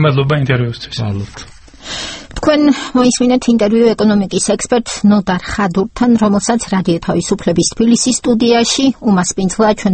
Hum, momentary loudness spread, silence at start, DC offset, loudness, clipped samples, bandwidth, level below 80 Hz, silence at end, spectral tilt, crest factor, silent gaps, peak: none; 10 LU; 0 s; under 0.1%; -13 LUFS; under 0.1%; 9 kHz; -38 dBFS; 0 s; -5 dB/octave; 12 dB; none; 0 dBFS